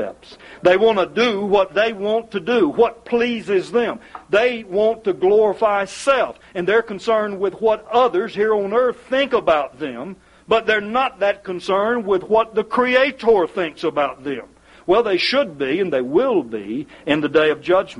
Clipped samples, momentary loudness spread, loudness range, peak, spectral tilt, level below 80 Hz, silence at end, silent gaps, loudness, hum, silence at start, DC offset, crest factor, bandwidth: under 0.1%; 9 LU; 2 LU; -2 dBFS; -5 dB/octave; -54 dBFS; 0 s; none; -19 LUFS; none; 0 s; under 0.1%; 16 dB; 11 kHz